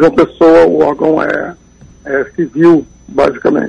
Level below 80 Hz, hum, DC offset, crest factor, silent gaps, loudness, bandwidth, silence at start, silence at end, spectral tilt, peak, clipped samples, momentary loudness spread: -42 dBFS; none; under 0.1%; 10 dB; none; -11 LUFS; 8 kHz; 0 s; 0 s; -7.5 dB/octave; 0 dBFS; under 0.1%; 11 LU